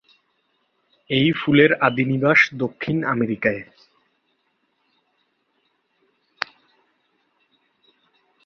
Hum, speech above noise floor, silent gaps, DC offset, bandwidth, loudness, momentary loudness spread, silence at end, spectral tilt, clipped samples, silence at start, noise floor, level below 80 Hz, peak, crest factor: none; 50 dB; none; under 0.1%; 6.8 kHz; -19 LUFS; 16 LU; 4.85 s; -6.5 dB/octave; under 0.1%; 1.1 s; -69 dBFS; -62 dBFS; -2 dBFS; 22 dB